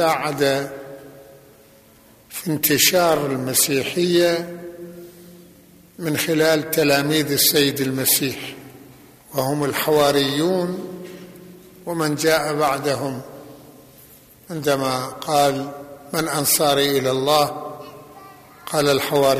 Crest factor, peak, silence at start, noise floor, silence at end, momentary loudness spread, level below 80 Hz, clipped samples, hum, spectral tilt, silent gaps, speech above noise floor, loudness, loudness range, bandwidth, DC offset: 18 dB; -4 dBFS; 0 s; -50 dBFS; 0 s; 20 LU; -58 dBFS; under 0.1%; none; -3.5 dB/octave; none; 31 dB; -19 LUFS; 5 LU; 15 kHz; under 0.1%